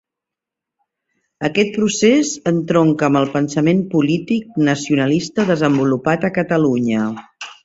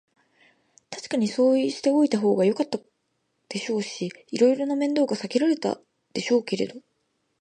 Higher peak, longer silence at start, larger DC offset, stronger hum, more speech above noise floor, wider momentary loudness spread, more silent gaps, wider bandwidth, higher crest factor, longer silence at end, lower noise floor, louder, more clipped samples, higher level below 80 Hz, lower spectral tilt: first, -2 dBFS vs -8 dBFS; first, 1.4 s vs 0.9 s; neither; neither; first, 69 dB vs 51 dB; second, 6 LU vs 13 LU; neither; second, 8 kHz vs 10 kHz; about the same, 16 dB vs 18 dB; second, 0.1 s vs 0.6 s; first, -85 dBFS vs -74 dBFS; first, -17 LUFS vs -24 LUFS; neither; first, -56 dBFS vs -76 dBFS; about the same, -5.5 dB/octave vs -5 dB/octave